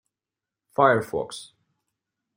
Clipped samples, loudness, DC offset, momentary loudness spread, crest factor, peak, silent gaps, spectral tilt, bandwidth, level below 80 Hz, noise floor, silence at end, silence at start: under 0.1%; -23 LUFS; under 0.1%; 16 LU; 24 dB; -4 dBFS; none; -5.5 dB/octave; 16.5 kHz; -66 dBFS; -89 dBFS; 0.95 s; 0.8 s